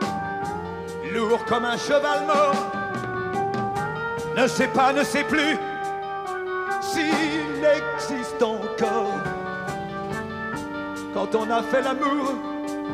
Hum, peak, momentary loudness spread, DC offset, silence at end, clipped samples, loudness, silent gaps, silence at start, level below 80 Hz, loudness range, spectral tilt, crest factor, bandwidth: none; -8 dBFS; 10 LU; under 0.1%; 0 s; under 0.1%; -24 LUFS; none; 0 s; -56 dBFS; 4 LU; -4.5 dB/octave; 16 dB; 15.5 kHz